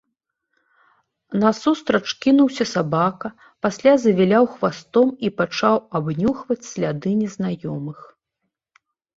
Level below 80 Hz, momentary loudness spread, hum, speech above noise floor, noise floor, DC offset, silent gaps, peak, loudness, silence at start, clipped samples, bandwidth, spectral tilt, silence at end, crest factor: -58 dBFS; 11 LU; none; 59 dB; -78 dBFS; under 0.1%; none; -2 dBFS; -20 LUFS; 1.3 s; under 0.1%; 7.8 kHz; -6 dB/octave; 1.15 s; 18 dB